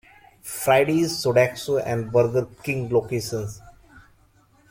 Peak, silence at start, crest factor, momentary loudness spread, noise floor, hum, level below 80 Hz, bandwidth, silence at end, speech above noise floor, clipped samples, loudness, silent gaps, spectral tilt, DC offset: -4 dBFS; 0.45 s; 20 dB; 12 LU; -58 dBFS; none; -54 dBFS; 16.5 kHz; 0.7 s; 36 dB; under 0.1%; -22 LUFS; none; -5 dB/octave; under 0.1%